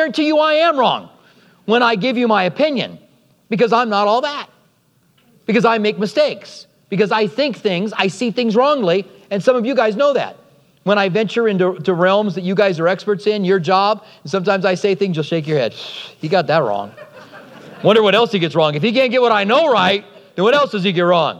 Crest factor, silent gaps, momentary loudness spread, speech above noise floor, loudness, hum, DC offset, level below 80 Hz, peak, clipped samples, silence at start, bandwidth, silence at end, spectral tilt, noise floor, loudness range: 16 dB; none; 11 LU; 42 dB; -16 LUFS; none; under 0.1%; -72 dBFS; 0 dBFS; under 0.1%; 0 s; 11 kHz; 0 s; -6 dB/octave; -58 dBFS; 4 LU